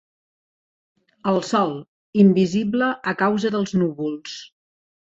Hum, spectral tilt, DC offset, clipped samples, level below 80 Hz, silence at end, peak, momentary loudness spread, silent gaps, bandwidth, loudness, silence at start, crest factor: none; -6.5 dB/octave; under 0.1%; under 0.1%; -62 dBFS; 0.55 s; -4 dBFS; 15 LU; 1.88-2.13 s; 7.8 kHz; -21 LUFS; 1.25 s; 18 dB